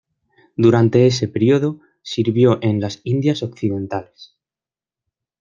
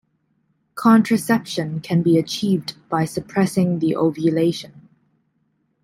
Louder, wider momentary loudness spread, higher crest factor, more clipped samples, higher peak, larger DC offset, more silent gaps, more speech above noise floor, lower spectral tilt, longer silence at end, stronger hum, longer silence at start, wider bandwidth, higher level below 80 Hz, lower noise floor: about the same, -18 LUFS vs -19 LUFS; first, 13 LU vs 10 LU; about the same, 16 dB vs 16 dB; neither; about the same, -2 dBFS vs -4 dBFS; neither; neither; first, over 73 dB vs 49 dB; about the same, -7 dB/octave vs -6.5 dB/octave; about the same, 1.15 s vs 1.05 s; neither; second, 0.6 s vs 0.75 s; second, 7.4 kHz vs 16 kHz; about the same, -58 dBFS vs -60 dBFS; first, under -90 dBFS vs -67 dBFS